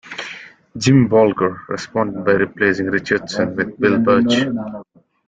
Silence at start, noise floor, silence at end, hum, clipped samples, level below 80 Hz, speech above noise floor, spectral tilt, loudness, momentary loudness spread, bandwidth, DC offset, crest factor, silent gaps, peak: 0.05 s; -37 dBFS; 0.45 s; none; under 0.1%; -52 dBFS; 20 dB; -6 dB/octave; -17 LUFS; 16 LU; 8.8 kHz; under 0.1%; 16 dB; none; -2 dBFS